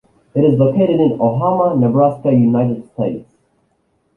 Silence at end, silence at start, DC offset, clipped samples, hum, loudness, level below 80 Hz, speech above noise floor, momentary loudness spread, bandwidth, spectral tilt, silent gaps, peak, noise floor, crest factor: 0.95 s; 0.35 s; under 0.1%; under 0.1%; none; -15 LUFS; -52 dBFS; 49 dB; 9 LU; 3.2 kHz; -11.5 dB/octave; none; -2 dBFS; -62 dBFS; 14 dB